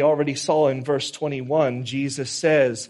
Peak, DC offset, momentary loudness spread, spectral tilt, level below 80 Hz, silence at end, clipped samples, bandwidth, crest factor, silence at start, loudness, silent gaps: -6 dBFS; under 0.1%; 7 LU; -4.5 dB/octave; -66 dBFS; 0.05 s; under 0.1%; 11.5 kHz; 16 dB; 0 s; -22 LUFS; none